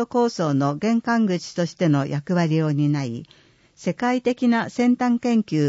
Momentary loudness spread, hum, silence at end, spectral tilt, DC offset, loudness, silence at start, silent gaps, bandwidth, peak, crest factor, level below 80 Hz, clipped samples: 6 LU; none; 0 s; -7 dB/octave; under 0.1%; -22 LUFS; 0 s; none; 8 kHz; -8 dBFS; 12 dB; -64 dBFS; under 0.1%